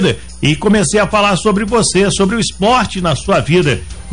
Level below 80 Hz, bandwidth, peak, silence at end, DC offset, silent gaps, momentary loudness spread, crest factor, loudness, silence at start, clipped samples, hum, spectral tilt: -32 dBFS; 10.5 kHz; -2 dBFS; 0 s; 2%; none; 5 LU; 10 dB; -13 LUFS; 0 s; under 0.1%; none; -4.5 dB/octave